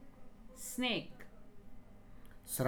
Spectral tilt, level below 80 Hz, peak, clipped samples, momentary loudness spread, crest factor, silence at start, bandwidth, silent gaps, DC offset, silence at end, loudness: -3.5 dB/octave; -58 dBFS; -20 dBFS; under 0.1%; 25 LU; 22 dB; 0 s; over 20 kHz; none; under 0.1%; 0 s; -39 LUFS